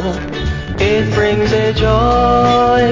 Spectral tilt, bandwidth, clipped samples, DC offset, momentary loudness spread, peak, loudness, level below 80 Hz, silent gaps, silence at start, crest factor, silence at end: -6.5 dB/octave; 7.6 kHz; under 0.1%; under 0.1%; 9 LU; -2 dBFS; -13 LUFS; -24 dBFS; none; 0 s; 12 dB; 0 s